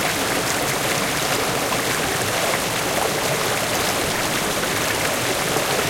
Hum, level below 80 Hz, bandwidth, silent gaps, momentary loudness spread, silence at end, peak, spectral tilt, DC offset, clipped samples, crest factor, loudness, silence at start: none; -46 dBFS; 16.5 kHz; none; 1 LU; 0 s; -6 dBFS; -2.5 dB/octave; under 0.1%; under 0.1%; 16 dB; -20 LUFS; 0 s